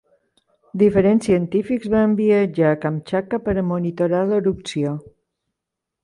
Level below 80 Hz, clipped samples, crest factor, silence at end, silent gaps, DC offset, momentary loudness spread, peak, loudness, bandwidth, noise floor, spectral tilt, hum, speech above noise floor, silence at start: -48 dBFS; under 0.1%; 16 dB; 1 s; none; under 0.1%; 8 LU; -4 dBFS; -19 LUFS; 11 kHz; -83 dBFS; -7.5 dB/octave; none; 64 dB; 0.75 s